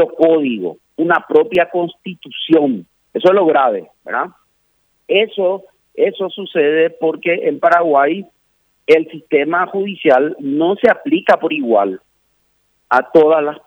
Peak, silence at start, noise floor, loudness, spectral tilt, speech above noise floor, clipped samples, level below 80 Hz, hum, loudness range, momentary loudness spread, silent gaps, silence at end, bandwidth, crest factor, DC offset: 0 dBFS; 0 s; -62 dBFS; -15 LUFS; -7 dB/octave; 48 dB; under 0.1%; -64 dBFS; none; 2 LU; 13 LU; none; 0.1 s; 6.2 kHz; 14 dB; under 0.1%